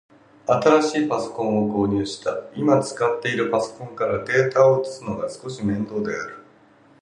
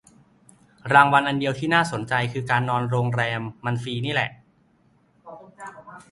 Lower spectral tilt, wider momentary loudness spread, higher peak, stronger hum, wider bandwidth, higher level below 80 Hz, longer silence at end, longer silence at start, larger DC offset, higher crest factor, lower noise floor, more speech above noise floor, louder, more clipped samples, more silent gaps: about the same, -6 dB/octave vs -5.5 dB/octave; second, 12 LU vs 22 LU; about the same, -2 dBFS vs 0 dBFS; neither; about the same, 11 kHz vs 11.5 kHz; about the same, -56 dBFS vs -60 dBFS; first, 0.6 s vs 0.1 s; second, 0.45 s vs 0.85 s; neither; about the same, 20 dB vs 24 dB; second, -53 dBFS vs -61 dBFS; second, 32 dB vs 39 dB; about the same, -22 LUFS vs -22 LUFS; neither; neither